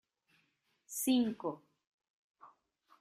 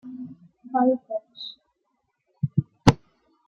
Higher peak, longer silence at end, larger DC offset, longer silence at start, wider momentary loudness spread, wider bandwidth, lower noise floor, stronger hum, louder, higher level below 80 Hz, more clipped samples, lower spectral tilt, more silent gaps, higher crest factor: second, -20 dBFS vs 0 dBFS; about the same, 0.55 s vs 0.55 s; neither; first, 0.9 s vs 0.05 s; second, 14 LU vs 18 LU; first, 15.5 kHz vs 10.5 kHz; about the same, -78 dBFS vs -75 dBFS; neither; second, -35 LUFS vs -24 LUFS; second, -82 dBFS vs -50 dBFS; neither; second, -3.5 dB/octave vs -6.5 dB/octave; first, 1.87-1.98 s, 2.10-2.35 s vs none; second, 20 dB vs 26 dB